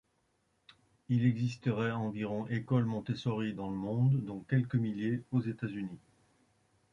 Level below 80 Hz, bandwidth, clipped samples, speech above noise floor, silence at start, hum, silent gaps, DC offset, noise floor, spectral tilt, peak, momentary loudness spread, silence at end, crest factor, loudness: -66 dBFS; 7.4 kHz; under 0.1%; 43 dB; 1.1 s; none; none; under 0.1%; -76 dBFS; -8.5 dB/octave; -16 dBFS; 8 LU; 0.95 s; 18 dB; -34 LUFS